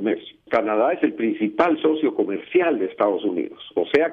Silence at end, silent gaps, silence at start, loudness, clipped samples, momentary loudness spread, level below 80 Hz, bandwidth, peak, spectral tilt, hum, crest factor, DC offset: 0 s; none; 0 s; -22 LUFS; under 0.1%; 7 LU; -64 dBFS; 5.6 kHz; -6 dBFS; -7.5 dB/octave; none; 16 dB; under 0.1%